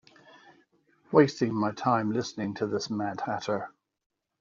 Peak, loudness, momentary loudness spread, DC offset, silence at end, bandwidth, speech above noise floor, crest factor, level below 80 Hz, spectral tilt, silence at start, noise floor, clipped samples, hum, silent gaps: -6 dBFS; -28 LUFS; 10 LU; under 0.1%; 0.7 s; 7.6 kHz; 38 dB; 22 dB; -70 dBFS; -5.5 dB/octave; 1.1 s; -66 dBFS; under 0.1%; none; none